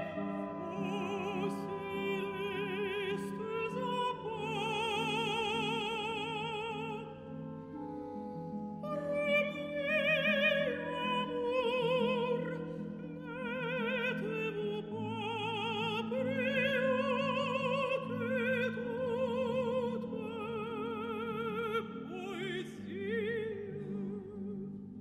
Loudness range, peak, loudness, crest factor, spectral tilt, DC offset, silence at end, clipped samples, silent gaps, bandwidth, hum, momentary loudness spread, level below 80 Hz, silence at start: 6 LU; -18 dBFS; -35 LUFS; 18 dB; -5.5 dB/octave; under 0.1%; 0 s; under 0.1%; none; 13.5 kHz; none; 11 LU; -70 dBFS; 0 s